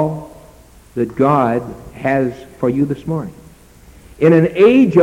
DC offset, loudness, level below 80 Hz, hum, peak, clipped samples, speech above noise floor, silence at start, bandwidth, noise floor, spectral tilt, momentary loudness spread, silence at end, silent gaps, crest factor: under 0.1%; -15 LUFS; -46 dBFS; none; -2 dBFS; under 0.1%; 30 dB; 0 s; 13.5 kHz; -43 dBFS; -8.5 dB/octave; 16 LU; 0 s; none; 14 dB